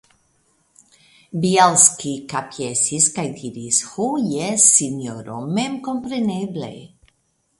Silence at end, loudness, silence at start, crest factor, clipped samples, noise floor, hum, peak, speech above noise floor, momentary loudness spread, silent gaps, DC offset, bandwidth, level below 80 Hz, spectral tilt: 0.7 s; -18 LUFS; 1.35 s; 22 dB; under 0.1%; -67 dBFS; none; 0 dBFS; 47 dB; 17 LU; none; under 0.1%; 12 kHz; -62 dBFS; -3 dB/octave